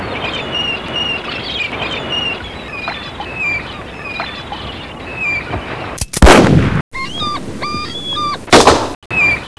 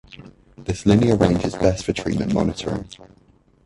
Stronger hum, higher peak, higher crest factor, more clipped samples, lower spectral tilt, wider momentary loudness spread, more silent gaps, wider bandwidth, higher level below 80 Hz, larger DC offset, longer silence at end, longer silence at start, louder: neither; about the same, 0 dBFS vs -2 dBFS; about the same, 16 dB vs 20 dB; first, 0.6% vs under 0.1%; second, -4 dB/octave vs -6.5 dB/octave; first, 17 LU vs 13 LU; first, 6.81-6.91 s, 8.95-9.10 s vs none; about the same, 11 kHz vs 11.5 kHz; first, -26 dBFS vs -38 dBFS; neither; second, 0.1 s vs 0.6 s; about the same, 0 s vs 0.1 s; first, -15 LUFS vs -20 LUFS